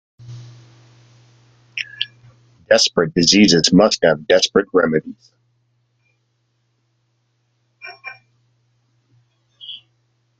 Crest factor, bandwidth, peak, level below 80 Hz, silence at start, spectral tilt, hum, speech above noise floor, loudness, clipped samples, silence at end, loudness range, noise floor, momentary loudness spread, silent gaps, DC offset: 20 dB; 9.4 kHz; 0 dBFS; -54 dBFS; 0.3 s; -3.5 dB/octave; none; 52 dB; -15 LUFS; under 0.1%; 0.65 s; 8 LU; -67 dBFS; 27 LU; none; under 0.1%